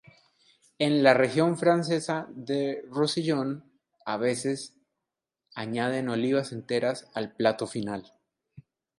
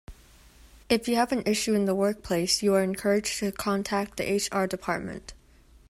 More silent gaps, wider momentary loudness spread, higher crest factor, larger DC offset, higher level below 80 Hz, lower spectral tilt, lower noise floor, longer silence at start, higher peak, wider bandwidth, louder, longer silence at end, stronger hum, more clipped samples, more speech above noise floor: neither; first, 13 LU vs 6 LU; about the same, 22 dB vs 18 dB; neither; second, -72 dBFS vs -54 dBFS; first, -5.5 dB/octave vs -4 dB/octave; first, -87 dBFS vs -56 dBFS; first, 0.8 s vs 0.1 s; first, -6 dBFS vs -10 dBFS; second, 11.5 kHz vs 16 kHz; about the same, -27 LUFS vs -26 LUFS; second, 0.4 s vs 0.55 s; neither; neither; first, 60 dB vs 29 dB